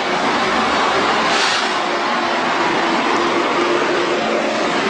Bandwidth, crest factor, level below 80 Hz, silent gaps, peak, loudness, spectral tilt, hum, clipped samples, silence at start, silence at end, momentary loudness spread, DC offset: 10.5 kHz; 14 dB; -52 dBFS; none; -2 dBFS; -16 LUFS; -3 dB/octave; none; under 0.1%; 0 s; 0 s; 3 LU; under 0.1%